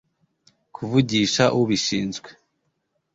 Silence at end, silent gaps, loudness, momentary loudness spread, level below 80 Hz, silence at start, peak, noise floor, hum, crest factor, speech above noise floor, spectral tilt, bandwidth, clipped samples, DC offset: 0.85 s; none; -21 LUFS; 13 LU; -56 dBFS; 0.8 s; -4 dBFS; -73 dBFS; none; 20 dB; 52 dB; -4.5 dB/octave; 8 kHz; under 0.1%; under 0.1%